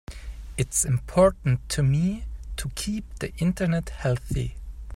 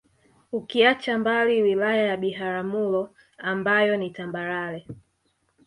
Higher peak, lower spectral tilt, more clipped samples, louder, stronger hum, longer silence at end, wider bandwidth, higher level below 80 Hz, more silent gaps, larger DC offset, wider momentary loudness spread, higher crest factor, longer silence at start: about the same, -6 dBFS vs -4 dBFS; about the same, -5.5 dB/octave vs -6 dB/octave; neither; about the same, -26 LUFS vs -24 LUFS; neither; second, 0 s vs 0.65 s; first, 16 kHz vs 11 kHz; first, -38 dBFS vs -66 dBFS; neither; neither; about the same, 15 LU vs 13 LU; about the same, 20 dB vs 20 dB; second, 0.1 s vs 0.5 s